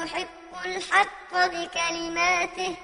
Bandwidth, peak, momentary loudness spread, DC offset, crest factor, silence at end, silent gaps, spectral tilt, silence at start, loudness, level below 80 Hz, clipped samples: 11 kHz; -6 dBFS; 10 LU; under 0.1%; 22 dB; 0 s; none; -1.5 dB/octave; 0 s; -25 LUFS; -56 dBFS; under 0.1%